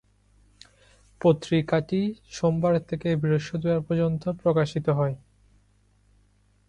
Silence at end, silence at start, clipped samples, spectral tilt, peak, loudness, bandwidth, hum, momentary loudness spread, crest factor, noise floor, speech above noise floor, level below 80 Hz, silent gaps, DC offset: 1.5 s; 1.2 s; under 0.1%; -7.5 dB/octave; -8 dBFS; -25 LUFS; 9.6 kHz; none; 4 LU; 18 dB; -63 dBFS; 38 dB; -56 dBFS; none; under 0.1%